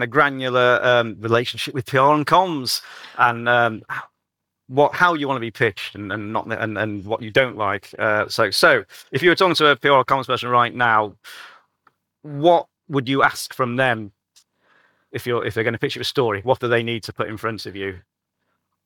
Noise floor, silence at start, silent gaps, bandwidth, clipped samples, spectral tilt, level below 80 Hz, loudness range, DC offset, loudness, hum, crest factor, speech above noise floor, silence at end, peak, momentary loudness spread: -80 dBFS; 0 s; none; 19 kHz; under 0.1%; -4.5 dB/octave; -64 dBFS; 6 LU; under 0.1%; -19 LUFS; none; 18 dB; 60 dB; 0.9 s; -4 dBFS; 13 LU